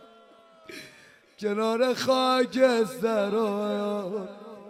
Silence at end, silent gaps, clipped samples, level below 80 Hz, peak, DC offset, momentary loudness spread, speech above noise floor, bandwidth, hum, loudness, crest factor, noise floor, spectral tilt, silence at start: 0 s; none; under 0.1%; -76 dBFS; -8 dBFS; under 0.1%; 19 LU; 29 dB; 15.5 kHz; none; -26 LUFS; 18 dB; -55 dBFS; -4.5 dB/octave; 0.7 s